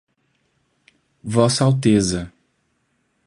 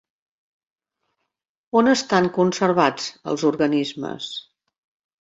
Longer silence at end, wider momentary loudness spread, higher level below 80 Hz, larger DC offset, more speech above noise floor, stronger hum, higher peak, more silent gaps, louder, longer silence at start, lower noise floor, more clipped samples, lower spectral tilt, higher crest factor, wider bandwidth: first, 1 s vs 0.8 s; first, 18 LU vs 12 LU; first, -48 dBFS vs -64 dBFS; neither; second, 51 dB vs 59 dB; neither; about the same, 0 dBFS vs -2 dBFS; neither; first, -18 LUFS vs -21 LUFS; second, 1.25 s vs 1.75 s; second, -68 dBFS vs -79 dBFS; neither; about the same, -5.5 dB/octave vs -5 dB/octave; about the same, 20 dB vs 20 dB; first, 11.5 kHz vs 8 kHz